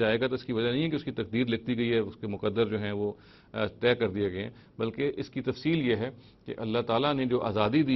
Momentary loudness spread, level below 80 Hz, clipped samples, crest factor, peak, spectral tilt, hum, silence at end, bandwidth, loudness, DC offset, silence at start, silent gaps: 10 LU; -60 dBFS; under 0.1%; 18 dB; -10 dBFS; -8.5 dB/octave; none; 0 s; 6 kHz; -30 LUFS; under 0.1%; 0 s; none